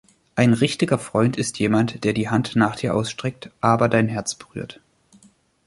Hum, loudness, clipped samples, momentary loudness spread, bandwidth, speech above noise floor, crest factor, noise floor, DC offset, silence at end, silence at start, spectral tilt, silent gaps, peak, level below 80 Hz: none; -21 LUFS; under 0.1%; 12 LU; 11.5 kHz; 35 dB; 20 dB; -56 dBFS; under 0.1%; 0.95 s; 0.35 s; -5.5 dB/octave; none; -2 dBFS; -54 dBFS